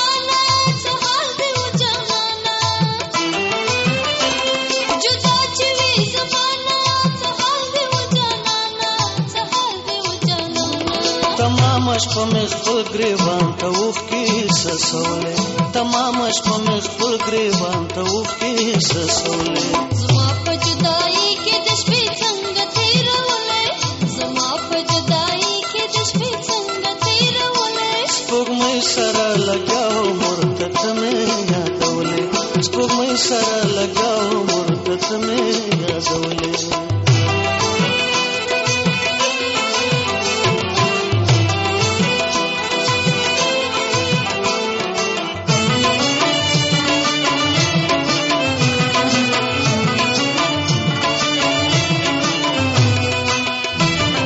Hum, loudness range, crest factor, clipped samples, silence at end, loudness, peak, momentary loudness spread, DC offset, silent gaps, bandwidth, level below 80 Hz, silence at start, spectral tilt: none; 2 LU; 14 dB; under 0.1%; 0 s; -17 LUFS; -4 dBFS; 4 LU; under 0.1%; none; 8.2 kHz; -48 dBFS; 0 s; -3.5 dB/octave